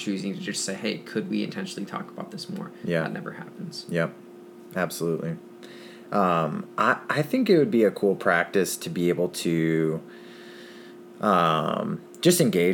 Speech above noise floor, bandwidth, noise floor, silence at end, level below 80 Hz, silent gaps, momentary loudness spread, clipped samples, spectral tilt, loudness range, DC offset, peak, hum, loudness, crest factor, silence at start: 20 dB; 19.5 kHz; -45 dBFS; 0 s; -70 dBFS; none; 23 LU; under 0.1%; -5 dB/octave; 8 LU; under 0.1%; -6 dBFS; none; -25 LUFS; 20 dB; 0 s